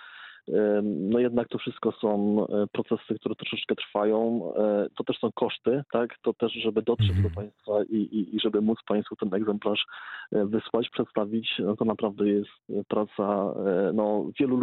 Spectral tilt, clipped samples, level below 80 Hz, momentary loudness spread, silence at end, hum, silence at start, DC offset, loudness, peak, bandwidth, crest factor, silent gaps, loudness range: -5.5 dB/octave; under 0.1%; -58 dBFS; 6 LU; 0 s; none; 0 s; under 0.1%; -27 LUFS; -10 dBFS; 4.4 kHz; 16 dB; none; 1 LU